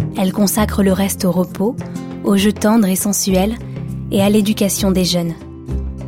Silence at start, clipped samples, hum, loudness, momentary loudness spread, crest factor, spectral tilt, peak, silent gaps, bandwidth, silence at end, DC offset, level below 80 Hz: 0 s; under 0.1%; none; -16 LUFS; 12 LU; 14 dB; -5 dB/octave; -2 dBFS; none; 16.5 kHz; 0 s; under 0.1%; -32 dBFS